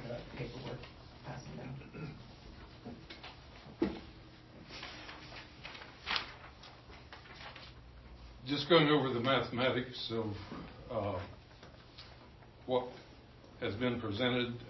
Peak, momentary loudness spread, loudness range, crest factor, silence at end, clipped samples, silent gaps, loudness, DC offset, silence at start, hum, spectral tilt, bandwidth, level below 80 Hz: -14 dBFS; 23 LU; 12 LU; 24 dB; 0 s; under 0.1%; none; -36 LUFS; under 0.1%; 0 s; none; -3.5 dB/octave; 6 kHz; -60 dBFS